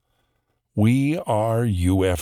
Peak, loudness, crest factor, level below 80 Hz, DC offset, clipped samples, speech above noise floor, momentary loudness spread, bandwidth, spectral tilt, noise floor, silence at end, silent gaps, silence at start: -8 dBFS; -21 LUFS; 14 dB; -42 dBFS; under 0.1%; under 0.1%; 52 dB; 3 LU; 14 kHz; -7 dB/octave; -71 dBFS; 0 s; none; 0.75 s